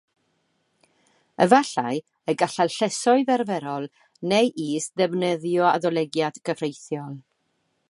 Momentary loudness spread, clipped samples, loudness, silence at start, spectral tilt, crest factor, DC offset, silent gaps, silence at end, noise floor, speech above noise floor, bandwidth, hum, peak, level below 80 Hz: 14 LU; under 0.1%; -23 LUFS; 1.4 s; -4.5 dB/octave; 22 dB; under 0.1%; none; 0.7 s; -72 dBFS; 49 dB; 11.5 kHz; none; -2 dBFS; -74 dBFS